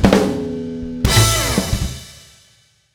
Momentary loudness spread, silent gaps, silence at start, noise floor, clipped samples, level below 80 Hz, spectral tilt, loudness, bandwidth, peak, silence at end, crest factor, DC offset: 14 LU; none; 0 s; -55 dBFS; under 0.1%; -28 dBFS; -4.5 dB/octave; -17 LUFS; over 20 kHz; 0 dBFS; 0.75 s; 18 dB; under 0.1%